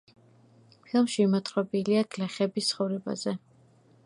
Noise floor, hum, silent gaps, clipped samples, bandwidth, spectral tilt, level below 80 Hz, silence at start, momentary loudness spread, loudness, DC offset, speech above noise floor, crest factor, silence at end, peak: -60 dBFS; none; none; under 0.1%; 11.5 kHz; -5.5 dB/octave; -76 dBFS; 0.95 s; 8 LU; -28 LUFS; under 0.1%; 33 dB; 16 dB; 0.7 s; -12 dBFS